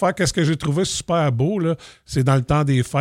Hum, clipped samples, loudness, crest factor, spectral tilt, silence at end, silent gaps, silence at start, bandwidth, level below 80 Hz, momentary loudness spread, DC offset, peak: none; under 0.1%; -20 LUFS; 14 dB; -5.5 dB/octave; 0 s; none; 0 s; 14 kHz; -42 dBFS; 5 LU; under 0.1%; -6 dBFS